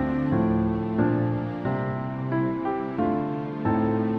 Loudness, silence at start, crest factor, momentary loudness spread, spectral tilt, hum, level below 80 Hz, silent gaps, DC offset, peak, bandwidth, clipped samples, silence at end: -26 LUFS; 0 s; 16 dB; 5 LU; -10.5 dB/octave; none; -46 dBFS; none; under 0.1%; -10 dBFS; 5.2 kHz; under 0.1%; 0 s